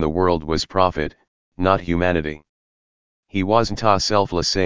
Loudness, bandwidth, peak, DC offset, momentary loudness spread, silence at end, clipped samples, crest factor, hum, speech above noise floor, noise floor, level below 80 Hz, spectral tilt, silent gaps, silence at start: -20 LUFS; 7.6 kHz; 0 dBFS; 1%; 10 LU; 0 s; under 0.1%; 20 dB; none; over 71 dB; under -90 dBFS; -38 dBFS; -5 dB/octave; 1.28-1.52 s, 2.49-3.23 s; 0 s